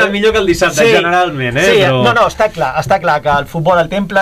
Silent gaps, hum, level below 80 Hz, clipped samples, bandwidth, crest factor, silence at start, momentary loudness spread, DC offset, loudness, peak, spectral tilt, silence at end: none; none; -36 dBFS; under 0.1%; 15.5 kHz; 10 dB; 0 s; 5 LU; under 0.1%; -11 LUFS; -2 dBFS; -4.5 dB/octave; 0 s